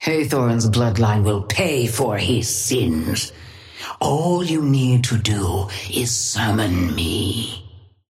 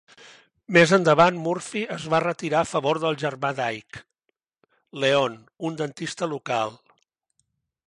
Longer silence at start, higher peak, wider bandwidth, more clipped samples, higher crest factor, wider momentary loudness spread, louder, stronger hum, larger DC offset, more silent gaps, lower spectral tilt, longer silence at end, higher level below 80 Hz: second, 0 s vs 0.7 s; about the same, -4 dBFS vs -4 dBFS; first, 16.5 kHz vs 11.5 kHz; neither; second, 14 dB vs 20 dB; second, 7 LU vs 15 LU; first, -19 LUFS vs -23 LUFS; neither; neither; neither; about the same, -4.5 dB/octave vs -5 dB/octave; second, 0.3 s vs 1.1 s; first, -42 dBFS vs -66 dBFS